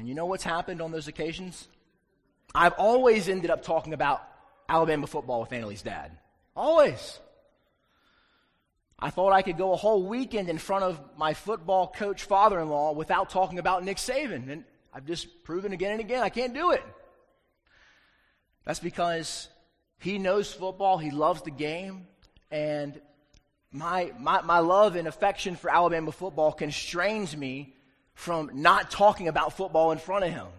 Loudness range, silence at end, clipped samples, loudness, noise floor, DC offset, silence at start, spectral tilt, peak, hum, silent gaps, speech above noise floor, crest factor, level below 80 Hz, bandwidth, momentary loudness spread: 6 LU; 0 s; under 0.1%; -27 LUFS; -73 dBFS; under 0.1%; 0 s; -4.5 dB/octave; -4 dBFS; none; none; 46 dB; 24 dB; -56 dBFS; 14.5 kHz; 15 LU